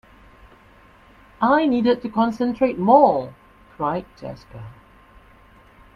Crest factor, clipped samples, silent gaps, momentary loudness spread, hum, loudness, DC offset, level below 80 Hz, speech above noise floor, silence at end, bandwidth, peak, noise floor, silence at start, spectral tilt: 20 dB; under 0.1%; none; 23 LU; none; -19 LUFS; under 0.1%; -54 dBFS; 31 dB; 1.25 s; 7.2 kHz; -2 dBFS; -51 dBFS; 1.4 s; -8 dB/octave